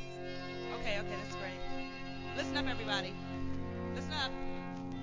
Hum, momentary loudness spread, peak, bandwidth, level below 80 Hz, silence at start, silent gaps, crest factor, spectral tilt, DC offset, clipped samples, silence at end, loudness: none; 7 LU; -20 dBFS; 7.6 kHz; -52 dBFS; 0 s; none; 18 dB; -5 dB/octave; 0.2%; under 0.1%; 0 s; -39 LUFS